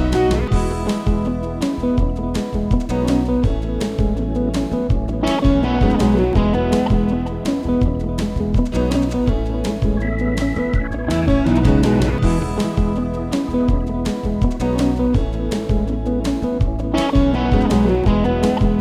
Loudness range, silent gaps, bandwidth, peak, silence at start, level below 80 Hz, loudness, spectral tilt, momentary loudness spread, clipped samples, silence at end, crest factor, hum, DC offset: 2 LU; none; 13 kHz; -2 dBFS; 0 s; -22 dBFS; -19 LUFS; -7.5 dB/octave; 6 LU; under 0.1%; 0 s; 16 dB; none; under 0.1%